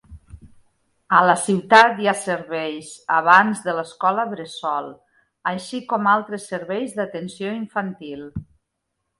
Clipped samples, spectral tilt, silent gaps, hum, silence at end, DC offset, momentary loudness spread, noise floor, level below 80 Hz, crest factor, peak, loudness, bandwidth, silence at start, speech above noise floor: under 0.1%; -4 dB/octave; none; none; 0.75 s; under 0.1%; 17 LU; -77 dBFS; -54 dBFS; 22 dB; 0 dBFS; -20 LUFS; 11.5 kHz; 0.1 s; 57 dB